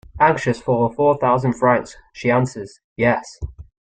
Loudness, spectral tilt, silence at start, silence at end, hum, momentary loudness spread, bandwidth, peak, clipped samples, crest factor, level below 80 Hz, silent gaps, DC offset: -19 LUFS; -7 dB/octave; 0.15 s; 0.3 s; none; 18 LU; 9.2 kHz; -2 dBFS; under 0.1%; 18 dB; -44 dBFS; 2.84-2.96 s; under 0.1%